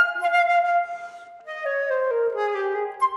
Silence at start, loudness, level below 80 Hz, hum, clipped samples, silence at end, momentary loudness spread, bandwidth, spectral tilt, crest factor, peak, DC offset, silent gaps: 0 s; -23 LUFS; -78 dBFS; none; under 0.1%; 0 s; 17 LU; 11.5 kHz; -2 dB/octave; 16 dB; -8 dBFS; under 0.1%; none